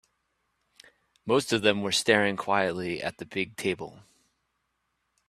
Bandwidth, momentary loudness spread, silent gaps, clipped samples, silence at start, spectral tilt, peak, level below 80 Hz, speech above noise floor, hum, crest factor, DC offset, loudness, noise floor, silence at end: 14 kHz; 11 LU; none; under 0.1%; 1.25 s; -3.5 dB/octave; -6 dBFS; -66 dBFS; 51 dB; none; 24 dB; under 0.1%; -27 LUFS; -78 dBFS; 1.3 s